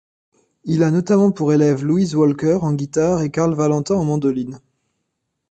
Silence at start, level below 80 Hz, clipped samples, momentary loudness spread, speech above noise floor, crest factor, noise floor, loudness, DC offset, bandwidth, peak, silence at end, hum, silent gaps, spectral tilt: 0.65 s; -52 dBFS; under 0.1%; 6 LU; 58 dB; 14 dB; -75 dBFS; -18 LUFS; under 0.1%; 8.8 kHz; -4 dBFS; 0.95 s; none; none; -7.5 dB/octave